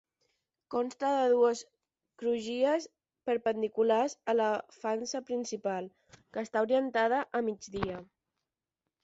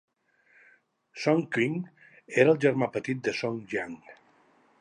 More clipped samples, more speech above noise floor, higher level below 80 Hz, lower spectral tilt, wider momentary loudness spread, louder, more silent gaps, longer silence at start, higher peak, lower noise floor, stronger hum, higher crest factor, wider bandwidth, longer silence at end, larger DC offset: neither; first, 58 dB vs 39 dB; first, -66 dBFS vs -74 dBFS; second, -4.5 dB/octave vs -6.5 dB/octave; second, 12 LU vs 18 LU; second, -31 LUFS vs -27 LUFS; neither; second, 0.7 s vs 1.15 s; second, -16 dBFS vs -6 dBFS; first, -89 dBFS vs -65 dBFS; neither; second, 16 dB vs 22 dB; second, 8 kHz vs 11 kHz; first, 1 s vs 0.7 s; neither